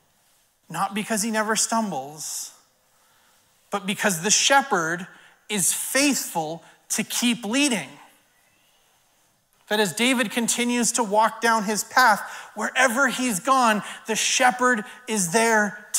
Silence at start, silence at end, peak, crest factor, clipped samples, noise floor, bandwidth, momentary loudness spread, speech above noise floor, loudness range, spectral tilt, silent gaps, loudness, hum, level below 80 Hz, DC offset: 0.7 s; 0 s; -4 dBFS; 20 dB; under 0.1%; -64 dBFS; 16 kHz; 12 LU; 41 dB; 6 LU; -2 dB/octave; none; -22 LUFS; none; -74 dBFS; under 0.1%